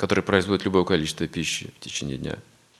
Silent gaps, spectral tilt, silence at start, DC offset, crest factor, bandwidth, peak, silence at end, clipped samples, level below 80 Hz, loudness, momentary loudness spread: none; -4.5 dB/octave; 0 s; under 0.1%; 24 dB; 13 kHz; -2 dBFS; 0.4 s; under 0.1%; -52 dBFS; -25 LUFS; 11 LU